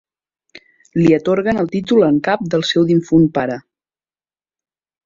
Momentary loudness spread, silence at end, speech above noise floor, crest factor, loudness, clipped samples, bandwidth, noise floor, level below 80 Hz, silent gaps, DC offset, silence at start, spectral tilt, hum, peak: 8 LU; 1.45 s; over 76 dB; 16 dB; -15 LUFS; under 0.1%; 7.6 kHz; under -90 dBFS; -52 dBFS; none; under 0.1%; 0.95 s; -7 dB/octave; none; -2 dBFS